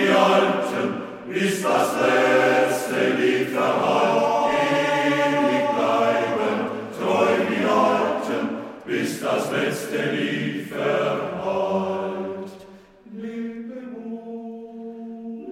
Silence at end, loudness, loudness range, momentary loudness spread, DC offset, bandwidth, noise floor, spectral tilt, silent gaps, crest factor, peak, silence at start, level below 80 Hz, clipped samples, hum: 0 s; -22 LUFS; 9 LU; 16 LU; under 0.1%; 16.5 kHz; -46 dBFS; -5 dB/octave; none; 18 dB; -4 dBFS; 0 s; -66 dBFS; under 0.1%; none